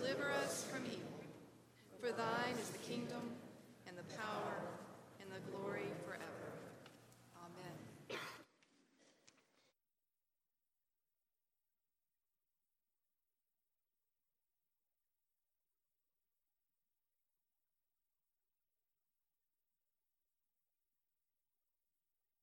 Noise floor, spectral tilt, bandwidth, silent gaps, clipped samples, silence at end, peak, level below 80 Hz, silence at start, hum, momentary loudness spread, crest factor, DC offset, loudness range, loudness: under -90 dBFS; -4 dB/octave; 17 kHz; none; under 0.1%; 13.15 s; -26 dBFS; -90 dBFS; 0 s; none; 20 LU; 26 dB; under 0.1%; 11 LU; -46 LUFS